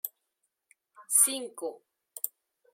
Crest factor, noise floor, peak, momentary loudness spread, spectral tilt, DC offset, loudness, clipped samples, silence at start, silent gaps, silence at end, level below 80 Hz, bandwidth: 24 dB; -81 dBFS; -10 dBFS; 18 LU; 1.5 dB/octave; under 0.1%; -27 LUFS; under 0.1%; 0.05 s; none; 0.45 s; under -90 dBFS; 16.5 kHz